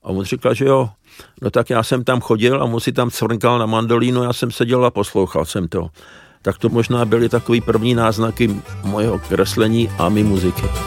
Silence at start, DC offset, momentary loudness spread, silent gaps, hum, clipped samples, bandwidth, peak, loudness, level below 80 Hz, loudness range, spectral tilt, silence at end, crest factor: 0.05 s; under 0.1%; 6 LU; none; none; under 0.1%; 17 kHz; -2 dBFS; -17 LUFS; -38 dBFS; 2 LU; -6 dB/octave; 0 s; 16 dB